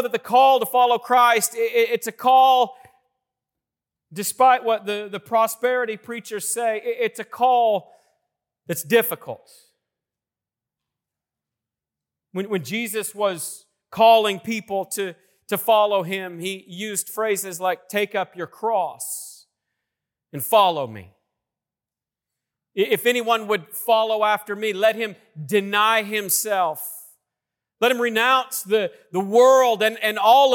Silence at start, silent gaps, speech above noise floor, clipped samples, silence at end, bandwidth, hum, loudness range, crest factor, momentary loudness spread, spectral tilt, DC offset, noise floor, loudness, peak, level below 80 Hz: 0 s; none; 69 dB; under 0.1%; 0 s; 18 kHz; none; 8 LU; 16 dB; 15 LU; -2.5 dB/octave; under 0.1%; -90 dBFS; -20 LUFS; -4 dBFS; -78 dBFS